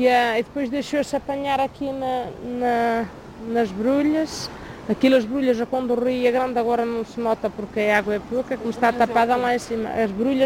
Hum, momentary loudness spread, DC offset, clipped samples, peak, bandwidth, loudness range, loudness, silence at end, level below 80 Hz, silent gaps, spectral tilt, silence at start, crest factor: none; 9 LU; under 0.1%; under 0.1%; -4 dBFS; 16 kHz; 3 LU; -22 LUFS; 0 s; -50 dBFS; none; -5 dB/octave; 0 s; 16 dB